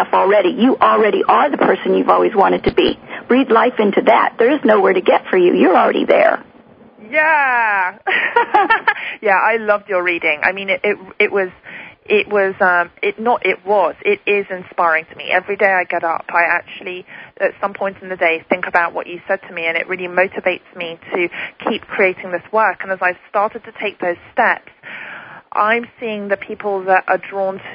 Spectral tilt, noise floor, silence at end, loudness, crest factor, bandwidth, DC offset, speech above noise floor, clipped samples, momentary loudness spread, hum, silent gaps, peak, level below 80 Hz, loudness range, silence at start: -7.5 dB/octave; -44 dBFS; 0 s; -16 LUFS; 16 dB; 5.2 kHz; under 0.1%; 29 dB; under 0.1%; 11 LU; none; none; 0 dBFS; -52 dBFS; 6 LU; 0 s